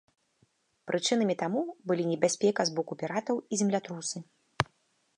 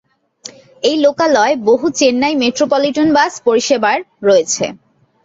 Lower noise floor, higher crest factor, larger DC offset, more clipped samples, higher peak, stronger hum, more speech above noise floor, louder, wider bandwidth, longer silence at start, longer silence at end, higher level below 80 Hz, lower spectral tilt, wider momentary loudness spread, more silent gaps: first, -72 dBFS vs -38 dBFS; first, 24 dB vs 14 dB; neither; neither; second, -8 dBFS vs 0 dBFS; neither; first, 42 dB vs 25 dB; second, -30 LUFS vs -13 LUFS; first, 11 kHz vs 8 kHz; first, 0.85 s vs 0.45 s; about the same, 0.55 s vs 0.5 s; second, -64 dBFS vs -58 dBFS; about the same, -4 dB/octave vs -3 dB/octave; about the same, 9 LU vs 9 LU; neither